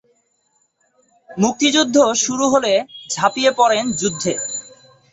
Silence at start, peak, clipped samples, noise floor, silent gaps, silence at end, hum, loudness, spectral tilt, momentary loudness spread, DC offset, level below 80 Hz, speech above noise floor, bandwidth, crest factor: 1.3 s; -2 dBFS; under 0.1%; -64 dBFS; none; 0.45 s; none; -17 LUFS; -3 dB/octave; 10 LU; under 0.1%; -58 dBFS; 48 dB; 8.2 kHz; 18 dB